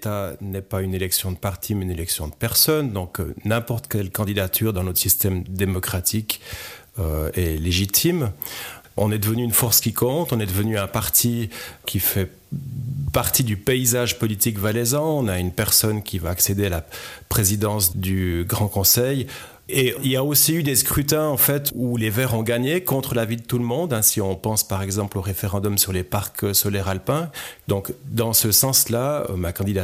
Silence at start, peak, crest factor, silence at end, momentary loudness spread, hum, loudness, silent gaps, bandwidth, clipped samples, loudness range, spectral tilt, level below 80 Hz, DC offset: 0 s; -4 dBFS; 18 dB; 0 s; 11 LU; none; -21 LUFS; none; 16 kHz; under 0.1%; 3 LU; -4 dB/octave; -42 dBFS; under 0.1%